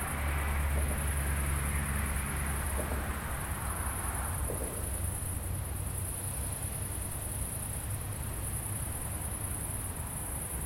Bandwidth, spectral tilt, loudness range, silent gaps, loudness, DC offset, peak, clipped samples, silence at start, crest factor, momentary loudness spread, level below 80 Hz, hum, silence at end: 16.5 kHz; -4 dB/octave; 3 LU; none; -35 LUFS; under 0.1%; -20 dBFS; under 0.1%; 0 s; 14 dB; 4 LU; -38 dBFS; none; 0 s